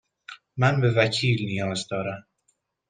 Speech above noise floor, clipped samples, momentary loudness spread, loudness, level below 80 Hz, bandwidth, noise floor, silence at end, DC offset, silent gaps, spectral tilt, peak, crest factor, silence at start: 48 dB; under 0.1%; 19 LU; -24 LUFS; -60 dBFS; 9.6 kHz; -72 dBFS; 0.7 s; under 0.1%; none; -5.5 dB/octave; -4 dBFS; 22 dB; 0.3 s